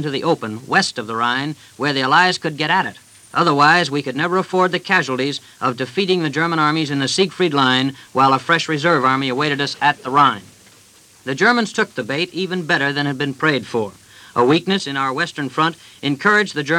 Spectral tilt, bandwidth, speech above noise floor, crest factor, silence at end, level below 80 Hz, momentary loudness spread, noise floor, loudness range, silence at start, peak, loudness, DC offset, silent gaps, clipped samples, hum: -4.5 dB/octave; 15.5 kHz; 31 dB; 18 dB; 0 s; -66 dBFS; 8 LU; -49 dBFS; 3 LU; 0 s; 0 dBFS; -17 LUFS; under 0.1%; none; under 0.1%; none